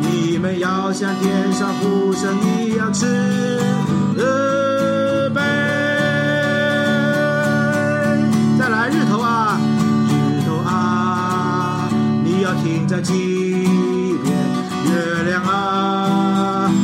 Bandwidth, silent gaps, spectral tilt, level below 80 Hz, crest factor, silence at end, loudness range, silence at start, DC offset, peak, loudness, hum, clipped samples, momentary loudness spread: 15.5 kHz; none; -6 dB/octave; -58 dBFS; 12 dB; 0 s; 2 LU; 0 s; under 0.1%; -4 dBFS; -17 LUFS; none; under 0.1%; 3 LU